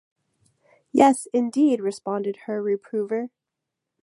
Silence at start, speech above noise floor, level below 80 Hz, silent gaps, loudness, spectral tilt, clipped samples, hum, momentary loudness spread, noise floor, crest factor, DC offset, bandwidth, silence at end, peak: 0.95 s; 62 dB; -76 dBFS; none; -23 LUFS; -5.5 dB/octave; under 0.1%; none; 10 LU; -84 dBFS; 22 dB; under 0.1%; 11.5 kHz; 0.75 s; -2 dBFS